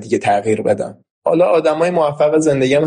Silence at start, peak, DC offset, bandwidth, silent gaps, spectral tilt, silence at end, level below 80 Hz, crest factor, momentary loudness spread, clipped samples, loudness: 0 s; -4 dBFS; under 0.1%; 10 kHz; 1.11-1.22 s; -6 dB/octave; 0 s; -56 dBFS; 12 dB; 7 LU; under 0.1%; -15 LUFS